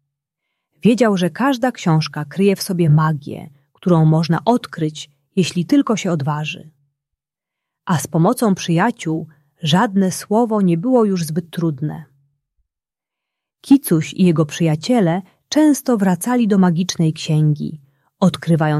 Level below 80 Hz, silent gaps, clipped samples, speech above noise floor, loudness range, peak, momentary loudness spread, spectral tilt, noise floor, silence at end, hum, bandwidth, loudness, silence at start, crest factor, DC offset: -60 dBFS; none; under 0.1%; 71 dB; 4 LU; -2 dBFS; 10 LU; -6.5 dB/octave; -87 dBFS; 0 s; none; 14 kHz; -17 LUFS; 0.85 s; 16 dB; under 0.1%